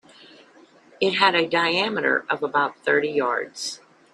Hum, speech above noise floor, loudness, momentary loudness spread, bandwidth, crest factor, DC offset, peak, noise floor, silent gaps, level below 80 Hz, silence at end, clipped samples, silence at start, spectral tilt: none; 30 dB; -22 LUFS; 12 LU; 12 kHz; 22 dB; under 0.1%; -2 dBFS; -53 dBFS; none; -72 dBFS; 0.35 s; under 0.1%; 1 s; -3 dB/octave